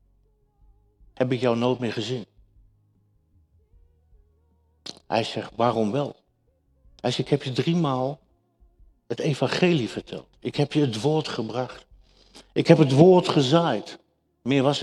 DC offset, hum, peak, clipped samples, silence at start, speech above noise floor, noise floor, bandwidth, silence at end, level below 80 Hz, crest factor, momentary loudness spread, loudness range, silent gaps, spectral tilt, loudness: under 0.1%; none; 0 dBFS; under 0.1%; 1.2 s; 45 dB; -67 dBFS; 11.5 kHz; 0 s; -60 dBFS; 24 dB; 17 LU; 10 LU; none; -6.5 dB/octave; -23 LUFS